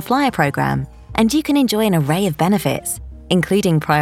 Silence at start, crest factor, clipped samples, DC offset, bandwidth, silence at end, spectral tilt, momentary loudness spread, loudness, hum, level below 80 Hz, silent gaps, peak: 0 s; 16 dB; under 0.1%; under 0.1%; 17 kHz; 0 s; -5.5 dB/octave; 8 LU; -17 LUFS; none; -42 dBFS; none; -2 dBFS